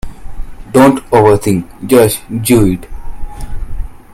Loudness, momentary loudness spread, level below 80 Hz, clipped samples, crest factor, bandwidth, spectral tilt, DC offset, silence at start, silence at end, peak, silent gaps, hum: -11 LUFS; 22 LU; -24 dBFS; 0.2%; 12 dB; 16.5 kHz; -6 dB/octave; under 0.1%; 0.05 s; 0.15 s; 0 dBFS; none; none